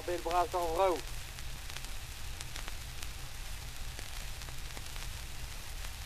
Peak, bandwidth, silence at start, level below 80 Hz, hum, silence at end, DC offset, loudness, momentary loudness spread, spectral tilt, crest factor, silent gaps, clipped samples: -14 dBFS; 15 kHz; 0 s; -44 dBFS; none; 0 s; under 0.1%; -39 LUFS; 12 LU; -3.5 dB/octave; 22 dB; none; under 0.1%